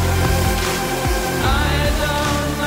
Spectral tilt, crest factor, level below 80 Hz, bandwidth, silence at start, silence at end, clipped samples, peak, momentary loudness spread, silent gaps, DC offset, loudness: -4.5 dB/octave; 12 dB; -24 dBFS; 16.5 kHz; 0 s; 0 s; under 0.1%; -6 dBFS; 2 LU; none; under 0.1%; -18 LUFS